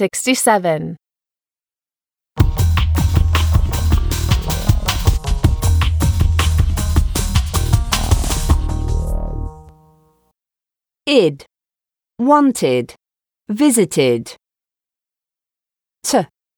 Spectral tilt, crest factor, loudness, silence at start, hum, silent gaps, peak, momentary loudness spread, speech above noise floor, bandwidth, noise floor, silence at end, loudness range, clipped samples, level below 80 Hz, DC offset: -5 dB/octave; 16 dB; -17 LUFS; 0 s; none; none; 0 dBFS; 11 LU; over 75 dB; over 20 kHz; under -90 dBFS; 0.35 s; 4 LU; under 0.1%; -22 dBFS; under 0.1%